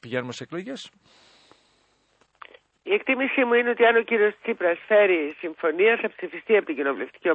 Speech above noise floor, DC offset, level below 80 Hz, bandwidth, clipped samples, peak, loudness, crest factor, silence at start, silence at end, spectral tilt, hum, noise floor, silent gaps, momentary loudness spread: 42 dB; under 0.1%; -74 dBFS; 8.4 kHz; under 0.1%; -8 dBFS; -23 LUFS; 18 dB; 0 s; 0 s; -5 dB/octave; none; -65 dBFS; none; 15 LU